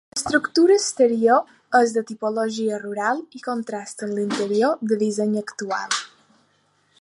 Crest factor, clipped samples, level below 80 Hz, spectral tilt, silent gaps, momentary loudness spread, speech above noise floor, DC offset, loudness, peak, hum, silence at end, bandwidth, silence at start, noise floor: 18 dB; under 0.1%; -66 dBFS; -3.5 dB/octave; none; 11 LU; 43 dB; under 0.1%; -22 LUFS; -2 dBFS; none; 0.95 s; 11.5 kHz; 0.15 s; -64 dBFS